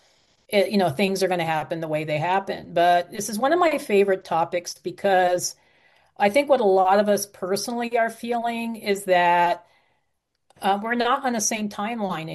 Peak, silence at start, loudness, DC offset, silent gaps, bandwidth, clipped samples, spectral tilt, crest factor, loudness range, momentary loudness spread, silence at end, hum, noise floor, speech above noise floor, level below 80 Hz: -6 dBFS; 0.5 s; -22 LUFS; under 0.1%; none; 12.5 kHz; under 0.1%; -4 dB/octave; 16 dB; 2 LU; 9 LU; 0 s; none; -76 dBFS; 54 dB; -68 dBFS